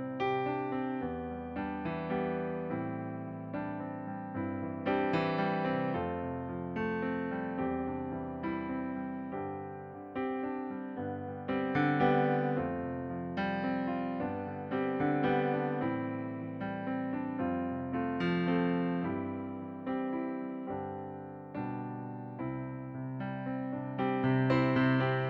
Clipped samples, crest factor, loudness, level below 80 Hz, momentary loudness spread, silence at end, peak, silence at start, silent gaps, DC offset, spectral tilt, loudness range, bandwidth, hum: under 0.1%; 18 dB; -34 LUFS; -62 dBFS; 10 LU; 0 s; -16 dBFS; 0 s; none; under 0.1%; -9.5 dB/octave; 6 LU; 5.8 kHz; none